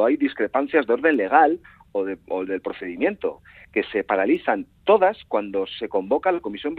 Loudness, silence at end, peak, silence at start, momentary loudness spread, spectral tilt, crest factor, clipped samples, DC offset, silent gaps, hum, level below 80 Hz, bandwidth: -22 LUFS; 0 s; -2 dBFS; 0 s; 11 LU; -7.5 dB/octave; 20 dB; under 0.1%; under 0.1%; none; none; -60 dBFS; 4.6 kHz